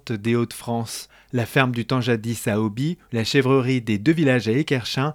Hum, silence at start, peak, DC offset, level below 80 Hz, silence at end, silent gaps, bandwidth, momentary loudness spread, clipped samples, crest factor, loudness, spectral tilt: none; 0.05 s; 0 dBFS; under 0.1%; -58 dBFS; 0 s; none; 17.5 kHz; 9 LU; under 0.1%; 22 dB; -22 LUFS; -6 dB/octave